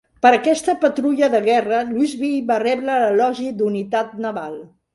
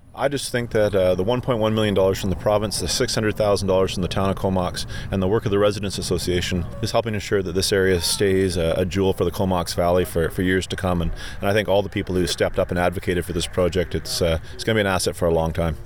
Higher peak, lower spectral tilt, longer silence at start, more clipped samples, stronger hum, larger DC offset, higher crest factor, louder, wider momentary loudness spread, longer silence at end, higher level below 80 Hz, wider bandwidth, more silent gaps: first, 0 dBFS vs -6 dBFS; about the same, -5 dB/octave vs -5 dB/octave; first, 0.25 s vs 0 s; neither; neither; second, under 0.1% vs 1%; about the same, 18 dB vs 16 dB; first, -18 LUFS vs -22 LUFS; first, 10 LU vs 5 LU; first, 0.3 s vs 0 s; second, -62 dBFS vs -36 dBFS; second, 11.5 kHz vs 19.5 kHz; neither